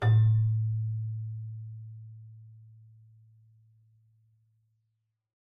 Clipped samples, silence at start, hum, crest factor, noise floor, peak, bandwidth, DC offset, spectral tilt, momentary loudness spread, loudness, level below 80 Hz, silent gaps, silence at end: under 0.1%; 0 s; none; 16 dB; -80 dBFS; -16 dBFS; 3.7 kHz; under 0.1%; -8 dB/octave; 27 LU; -29 LUFS; -58 dBFS; none; 2.95 s